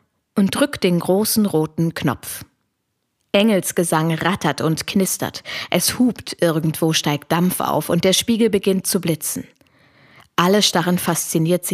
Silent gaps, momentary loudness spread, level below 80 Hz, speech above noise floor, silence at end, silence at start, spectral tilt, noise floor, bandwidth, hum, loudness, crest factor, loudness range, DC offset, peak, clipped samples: none; 7 LU; -54 dBFS; 54 dB; 0 s; 0.35 s; -4.5 dB/octave; -73 dBFS; 16 kHz; none; -19 LUFS; 18 dB; 2 LU; under 0.1%; 0 dBFS; under 0.1%